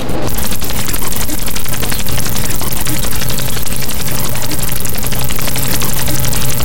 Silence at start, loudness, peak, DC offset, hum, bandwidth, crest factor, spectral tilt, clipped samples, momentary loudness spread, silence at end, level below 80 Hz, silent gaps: 0 s; -17 LUFS; -2 dBFS; 40%; none; 18 kHz; 14 dB; -3 dB/octave; under 0.1%; 3 LU; 0 s; -26 dBFS; none